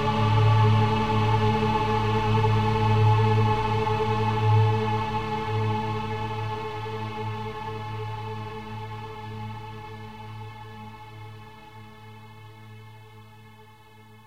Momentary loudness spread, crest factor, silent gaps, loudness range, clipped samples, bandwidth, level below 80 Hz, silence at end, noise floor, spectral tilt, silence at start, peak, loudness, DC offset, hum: 25 LU; 16 dB; none; 21 LU; under 0.1%; 7.4 kHz; -44 dBFS; 0 s; -51 dBFS; -7.5 dB/octave; 0 s; -10 dBFS; -25 LUFS; 0.6%; none